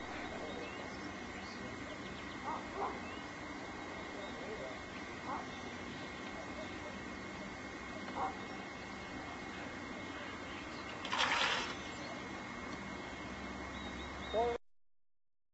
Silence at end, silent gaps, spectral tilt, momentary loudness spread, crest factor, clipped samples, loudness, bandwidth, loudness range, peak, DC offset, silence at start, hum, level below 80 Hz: 0.45 s; none; -2 dB/octave; 9 LU; 24 dB; under 0.1%; -42 LUFS; 8 kHz; 6 LU; -18 dBFS; under 0.1%; 0 s; none; -60 dBFS